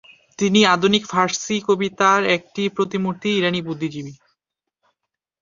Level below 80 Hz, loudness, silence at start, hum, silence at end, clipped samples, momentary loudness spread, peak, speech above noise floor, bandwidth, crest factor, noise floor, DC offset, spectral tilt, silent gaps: -62 dBFS; -19 LUFS; 0.4 s; none; 1.25 s; under 0.1%; 12 LU; -2 dBFS; 62 dB; 7.6 kHz; 20 dB; -81 dBFS; under 0.1%; -4 dB/octave; none